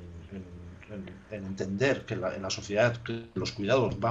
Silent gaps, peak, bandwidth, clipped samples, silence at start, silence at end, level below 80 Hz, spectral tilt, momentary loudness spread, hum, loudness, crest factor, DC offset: none; -12 dBFS; 8 kHz; under 0.1%; 0 s; 0 s; -56 dBFS; -5.5 dB/octave; 17 LU; none; -30 LUFS; 20 dB; under 0.1%